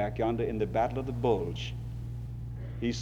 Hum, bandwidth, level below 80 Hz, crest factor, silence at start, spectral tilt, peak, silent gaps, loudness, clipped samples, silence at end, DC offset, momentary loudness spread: none; 8.2 kHz; -44 dBFS; 18 dB; 0 s; -7 dB/octave; -14 dBFS; none; -33 LUFS; under 0.1%; 0 s; under 0.1%; 10 LU